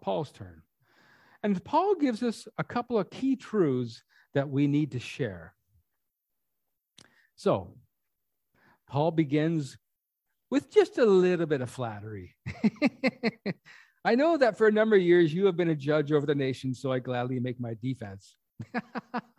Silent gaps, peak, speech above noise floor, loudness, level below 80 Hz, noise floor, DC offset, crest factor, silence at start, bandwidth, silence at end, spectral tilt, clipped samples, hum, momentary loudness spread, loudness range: none; -10 dBFS; 56 dB; -28 LUFS; -64 dBFS; -84 dBFS; under 0.1%; 20 dB; 0.05 s; 12 kHz; 0.2 s; -7 dB/octave; under 0.1%; none; 14 LU; 9 LU